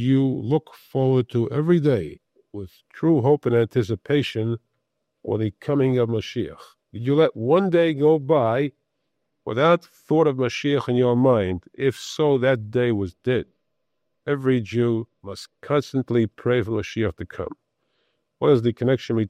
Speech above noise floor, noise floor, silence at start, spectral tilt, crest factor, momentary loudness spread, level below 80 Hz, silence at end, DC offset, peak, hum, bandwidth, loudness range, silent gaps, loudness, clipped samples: 57 dB; -78 dBFS; 0 s; -7.5 dB/octave; 18 dB; 15 LU; -58 dBFS; 0 s; under 0.1%; -4 dBFS; none; 13.5 kHz; 4 LU; none; -22 LUFS; under 0.1%